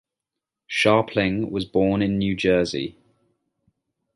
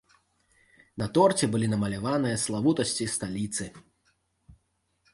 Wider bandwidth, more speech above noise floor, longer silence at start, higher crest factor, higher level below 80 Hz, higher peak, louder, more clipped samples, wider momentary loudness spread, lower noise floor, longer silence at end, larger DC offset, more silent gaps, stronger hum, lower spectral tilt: about the same, 11.5 kHz vs 11.5 kHz; first, 64 dB vs 47 dB; second, 0.7 s vs 0.95 s; about the same, 20 dB vs 20 dB; first, -50 dBFS vs -58 dBFS; first, -4 dBFS vs -8 dBFS; first, -22 LUFS vs -27 LUFS; neither; second, 9 LU vs 12 LU; first, -86 dBFS vs -73 dBFS; first, 1.25 s vs 0.6 s; neither; neither; neither; about the same, -6 dB/octave vs -5 dB/octave